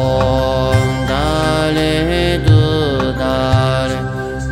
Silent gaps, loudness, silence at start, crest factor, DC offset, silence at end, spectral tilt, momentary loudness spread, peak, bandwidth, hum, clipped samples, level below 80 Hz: none; -15 LUFS; 0 s; 14 dB; under 0.1%; 0 s; -6.5 dB/octave; 5 LU; 0 dBFS; 15.5 kHz; none; under 0.1%; -26 dBFS